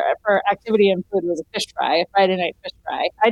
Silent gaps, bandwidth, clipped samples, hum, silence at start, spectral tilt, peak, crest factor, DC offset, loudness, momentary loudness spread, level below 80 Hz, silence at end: none; 12.5 kHz; under 0.1%; none; 0 s; -4.5 dB/octave; -6 dBFS; 14 dB; under 0.1%; -20 LUFS; 9 LU; -60 dBFS; 0 s